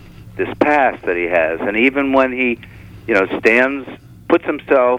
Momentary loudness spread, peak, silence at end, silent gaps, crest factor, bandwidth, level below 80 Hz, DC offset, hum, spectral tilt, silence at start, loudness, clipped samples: 14 LU; -2 dBFS; 0 s; none; 14 dB; 12.5 kHz; -46 dBFS; under 0.1%; none; -6.5 dB/octave; 0.05 s; -16 LUFS; under 0.1%